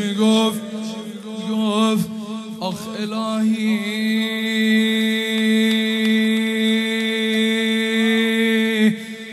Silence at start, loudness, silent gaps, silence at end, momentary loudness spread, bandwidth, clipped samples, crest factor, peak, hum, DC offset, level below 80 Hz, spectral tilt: 0 s; -19 LUFS; none; 0 s; 11 LU; 13.5 kHz; under 0.1%; 14 dB; -4 dBFS; none; under 0.1%; -68 dBFS; -4.5 dB/octave